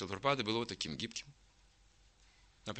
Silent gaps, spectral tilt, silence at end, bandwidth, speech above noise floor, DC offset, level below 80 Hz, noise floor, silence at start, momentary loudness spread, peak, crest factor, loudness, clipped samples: none; -4 dB/octave; 0 s; 8.4 kHz; 29 dB; under 0.1%; -66 dBFS; -67 dBFS; 0 s; 15 LU; -16 dBFS; 26 dB; -38 LUFS; under 0.1%